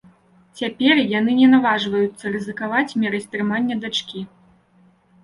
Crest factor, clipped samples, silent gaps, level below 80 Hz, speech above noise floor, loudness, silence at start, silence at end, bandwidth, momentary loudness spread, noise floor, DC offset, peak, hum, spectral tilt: 18 dB; under 0.1%; none; -62 dBFS; 37 dB; -19 LUFS; 0.55 s; 1 s; 11 kHz; 14 LU; -56 dBFS; under 0.1%; -4 dBFS; none; -5 dB/octave